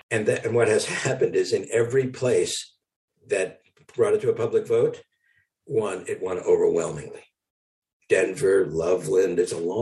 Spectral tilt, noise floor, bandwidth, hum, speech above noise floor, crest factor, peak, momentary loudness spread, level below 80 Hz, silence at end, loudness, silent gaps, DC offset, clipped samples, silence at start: -5 dB/octave; -68 dBFS; 12 kHz; none; 45 dB; 16 dB; -8 dBFS; 9 LU; -62 dBFS; 0 s; -24 LUFS; 2.96-3.08 s, 7.50-7.82 s, 7.93-8.00 s; under 0.1%; under 0.1%; 0.1 s